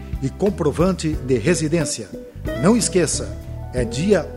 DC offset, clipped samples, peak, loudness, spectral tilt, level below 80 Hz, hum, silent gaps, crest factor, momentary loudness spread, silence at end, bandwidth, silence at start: under 0.1%; under 0.1%; -4 dBFS; -20 LUFS; -5 dB/octave; -34 dBFS; none; none; 16 dB; 12 LU; 0 s; 16 kHz; 0 s